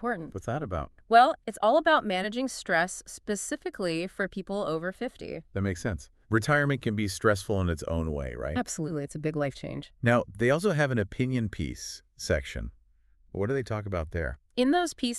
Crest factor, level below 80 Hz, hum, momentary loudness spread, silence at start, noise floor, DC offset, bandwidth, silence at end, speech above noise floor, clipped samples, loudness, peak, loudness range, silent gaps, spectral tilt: 22 dB; -46 dBFS; none; 12 LU; 0 s; -62 dBFS; under 0.1%; 13.5 kHz; 0 s; 34 dB; under 0.1%; -29 LUFS; -8 dBFS; 7 LU; none; -5.5 dB/octave